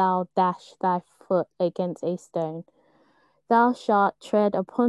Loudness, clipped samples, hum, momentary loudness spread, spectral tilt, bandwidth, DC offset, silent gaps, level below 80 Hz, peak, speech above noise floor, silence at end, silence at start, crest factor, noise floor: -25 LUFS; under 0.1%; none; 9 LU; -7.5 dB/octave; 11.5 kHz; under 0.1%; none; -74 dBFS; -6 dBFS; 40 dB; 0 s; 0 s; 18 dB; -63 dBFS